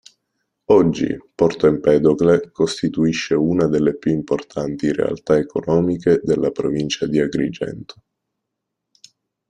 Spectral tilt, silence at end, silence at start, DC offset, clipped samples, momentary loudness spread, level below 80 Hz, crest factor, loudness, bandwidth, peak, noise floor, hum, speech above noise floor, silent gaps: -6.5 dB/octave; 1.65 s; 0.7 s; under 0.1%; under 0.1%; 8 LU; -50 dBFS; 16 dB; -18 LUFS; 10 kHz; -2 dBFS; -79 dBFS; none; 62 dB; none